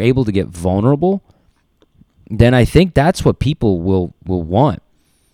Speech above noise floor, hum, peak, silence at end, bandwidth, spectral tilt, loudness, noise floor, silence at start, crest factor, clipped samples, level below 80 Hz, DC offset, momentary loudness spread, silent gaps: 43 dB; none; 0 dBFS; 0.55 s; 15 kHz; -7.5 dB/octave; -15 LUFS; -57 dBFS; 0 s; 16 dB; 0.2%; -32 dBFS; under 0.1%; 10 LU; none